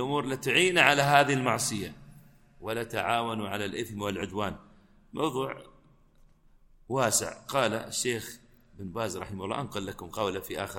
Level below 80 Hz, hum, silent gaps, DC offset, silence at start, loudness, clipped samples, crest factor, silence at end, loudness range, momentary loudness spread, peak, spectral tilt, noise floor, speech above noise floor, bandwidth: -58 dBFS; none; none; under 0.1%; 0 s; -28 LUFS; under 0.1%; 26 dB; 0 s; 9 LU; 16 LU; -4 dBFS; -3.5 dB/octave; -60 dBFS; 31 dB; 17 kHz